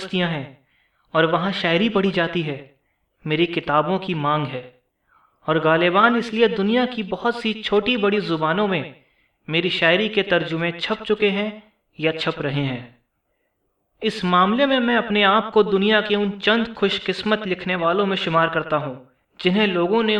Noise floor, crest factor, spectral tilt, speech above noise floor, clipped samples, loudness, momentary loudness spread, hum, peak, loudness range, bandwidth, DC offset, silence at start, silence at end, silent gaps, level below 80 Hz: -71 dBFS; 18 dB; -6.5 dB/octave; 51 dB; under 0.1%; -20 LUFS; 9 LU; none; -2 dBFS; 5 LU; 10 kHz; under 0.1%; 0 s; 0 s; none; -58 dBFS